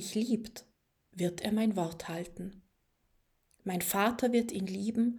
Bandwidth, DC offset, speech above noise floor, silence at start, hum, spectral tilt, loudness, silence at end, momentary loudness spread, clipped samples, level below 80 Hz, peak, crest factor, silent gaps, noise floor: over 20 kHz; under 0.1%; 42 dB; 0 s; none; -5 dB/octave; -33 LUFS; 0 s; 16 LU; under 0.1%; -66 dBFS; -16 dBFS; 18 dB; none; -74 dBFS